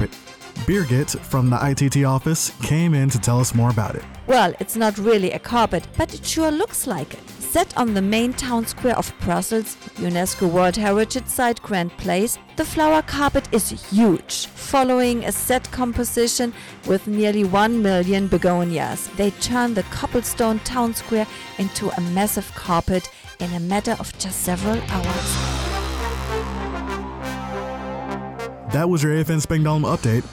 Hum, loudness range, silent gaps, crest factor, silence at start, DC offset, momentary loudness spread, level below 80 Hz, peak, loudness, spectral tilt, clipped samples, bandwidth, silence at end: none; 5 LU; none; 12 dB; 0 s; under 0.1%; 10 LU; -38 dBFS; -8 dBFS; -21 LUFS; -5 dB/octave; under 0.1%; 19 kHz; 0 s